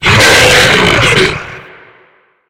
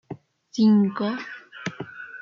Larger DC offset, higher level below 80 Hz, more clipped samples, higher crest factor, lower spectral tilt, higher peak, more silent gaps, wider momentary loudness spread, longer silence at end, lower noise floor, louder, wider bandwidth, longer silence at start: neither; first, -30 dBFS vs -70 dBFS; first, 0.6% vs under 0.1%; about the same, 10 dB vs 14 dB; second, -3 dB/octave vs -7 dB/octave; first, 0 dBFS vs -10 dBFS; neither; second, 14 LU vs 20 LU; first, 0.85 s vs 0 s; first, -48 dBFS vs -42 dBFS; first, -6 LUFS vs -23 LUFS; first, over 20 kHz vs 7 kHz; about the same, 0 s vs 0.1 s